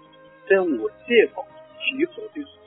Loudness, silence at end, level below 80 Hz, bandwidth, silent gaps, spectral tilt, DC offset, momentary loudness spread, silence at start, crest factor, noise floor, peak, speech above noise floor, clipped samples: -22 LUFS; 0.2 s; -68 dBFS; 4 kHz; none; -8 dB/octave; under 0.1%; 17 LU; 0.45 s; 20 dB; -47 dBFS; -4 dBFS; 25 dB; under 0.1%